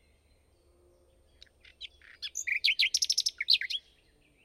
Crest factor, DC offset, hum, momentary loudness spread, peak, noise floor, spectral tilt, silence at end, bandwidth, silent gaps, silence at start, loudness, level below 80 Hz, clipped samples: 24 dB; under 0.1%; none; 22 LU; -12 dBFS; -66 dBFS; 4 dB/octave; 0.65 s; 16 kHz; none; 1.8 s; -27 LUFS; -68 dBFS; under 0.1%